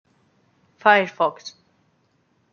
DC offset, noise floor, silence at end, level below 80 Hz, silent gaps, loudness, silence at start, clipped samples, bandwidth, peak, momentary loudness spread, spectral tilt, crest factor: under 0.1%; -65 dBFS; 1.05 s; -78 dBFS; none; -19 LUFS; 0.85 s; under 0.1%; 7 kHz; -2 dBFS; 23 LU; -4 dB/octave; 22 dB